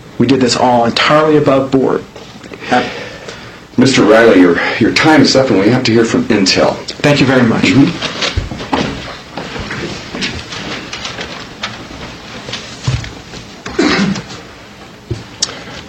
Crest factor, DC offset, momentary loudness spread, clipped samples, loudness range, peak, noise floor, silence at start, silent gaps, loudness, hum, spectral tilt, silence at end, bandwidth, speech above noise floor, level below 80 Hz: 12 dB; under 0.1%; 19 LU; 0.2%; 13 LU; 0 dBFS; -34 dBFS; 0.05 s; none; -12 LUFS; none; -5 dB/octave; 0 s; 10.5 kHz; 25 dB; -36 dBFS